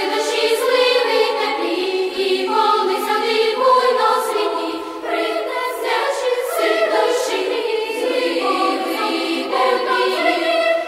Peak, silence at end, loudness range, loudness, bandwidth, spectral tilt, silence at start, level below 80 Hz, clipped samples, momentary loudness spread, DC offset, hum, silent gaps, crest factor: -2 dBFS; 0 s; 2 LU; -18 LUFS; 16 kHz; -1 dB/octave; 0 s; -64 dBFS; under 0.1%; 6 LU; under 0.1%; none; none; 16 dB